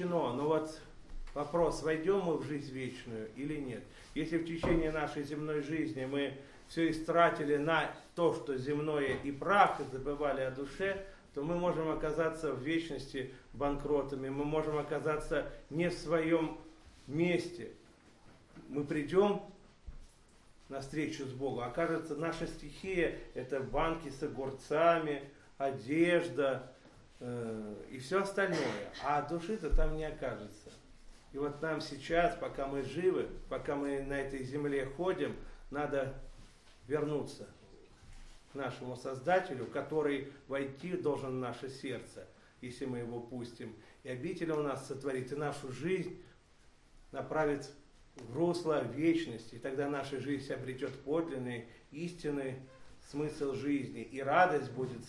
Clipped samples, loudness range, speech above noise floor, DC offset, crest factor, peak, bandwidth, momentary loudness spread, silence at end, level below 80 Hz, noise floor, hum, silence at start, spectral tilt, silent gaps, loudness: under 0.1%; 6 LU; 28 dB; under 0.1%; 24 dB; -12 dBFS; 12 kHz; 14 LU; 0 s; -50 dBFS; -63 dBFS; none; 0 s; -6 dB/octave; none; -36 LUFS